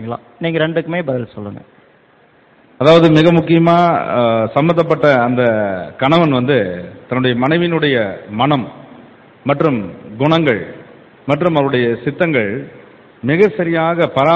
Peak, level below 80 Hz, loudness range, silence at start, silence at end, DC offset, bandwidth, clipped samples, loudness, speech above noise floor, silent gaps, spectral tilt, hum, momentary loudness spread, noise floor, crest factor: 0 dBFS; -50 dBFS; 5 LU; 0 s; 0 s; under 0.1%; 8 kHz; under 0.1%; -14 LUFS; 36 dB; none; -8 dB/octave; none; 13 LU; -50 dBFS; 14 dB